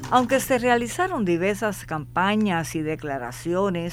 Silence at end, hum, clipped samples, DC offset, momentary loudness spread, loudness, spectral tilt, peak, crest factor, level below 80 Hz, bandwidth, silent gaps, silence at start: 0 s; none; under 0.1%; under 0.1%; 8 LU; -24 LUFS; -5 dB/octave; -6 dBFS; 18 dB; -48 dBFS; 17 kHz; none; 0 s